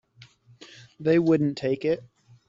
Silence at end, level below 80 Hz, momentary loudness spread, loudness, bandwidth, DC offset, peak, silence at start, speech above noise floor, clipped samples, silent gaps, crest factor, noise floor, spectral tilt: 0.5 s; -64 dBFS; 9 LU; -24 LUFS; 7.6 kHz; under 0.1%; -10 dBFS; 0.6 s; 31 dB; under 0.1%; none; 16 dB; -54 dBFS; -8 dB/octave